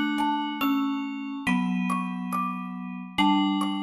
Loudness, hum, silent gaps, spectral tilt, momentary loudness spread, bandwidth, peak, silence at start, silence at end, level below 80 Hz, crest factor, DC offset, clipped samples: -27 LUFS; none; none; -5.5 dB/octave; 9 LU; 14.5 kHz; -10 dBFS; 0 s; 0 s; -62 dBFS; 16 dB; under 0.1%; under 0.1%